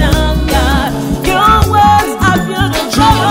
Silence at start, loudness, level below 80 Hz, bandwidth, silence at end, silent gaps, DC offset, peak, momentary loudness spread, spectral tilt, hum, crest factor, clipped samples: 0 s; -10 LUFS; -18 dBFS; 16.5 kHz; 0 s; none; under 0.1%; 0 dBFS; 6 LU; -5 dB/octave; none; 10 dB; under 0.1%